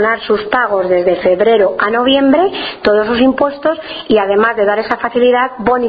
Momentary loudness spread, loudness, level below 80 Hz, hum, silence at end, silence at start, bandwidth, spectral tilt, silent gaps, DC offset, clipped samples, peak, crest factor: 5 LU; -12 LUFS; -46 dBFS; none; 0 s; 0 s; 5 kHz; -7.5 dB/octave; none; under 0.1%; under 0.1%; 0 dBFS; 12 dB